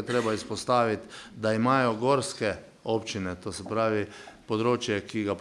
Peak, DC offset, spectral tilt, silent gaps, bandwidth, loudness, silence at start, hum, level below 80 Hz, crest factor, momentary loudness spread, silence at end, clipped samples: -10 dBFS; under 0.1%; -5 dB/octave; none; 12 kHz; -28 LUFS; 0 s; none; -64 dBFS; 18 dB; 11 LU; 0 s; under 0.1%